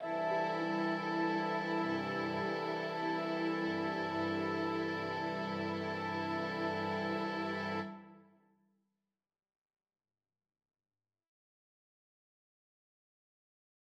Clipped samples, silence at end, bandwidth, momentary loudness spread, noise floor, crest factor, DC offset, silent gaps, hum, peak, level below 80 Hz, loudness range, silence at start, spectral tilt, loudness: under 0.1%; 5.7 s; 8.8 kHz; 3 LU; under -90 dBFS; 16 dB; under 0.1%; none; none; -22 dBFS; -88 dBFS; 7 LU; 0 s; -6.5 dB/octave; -36 LUFS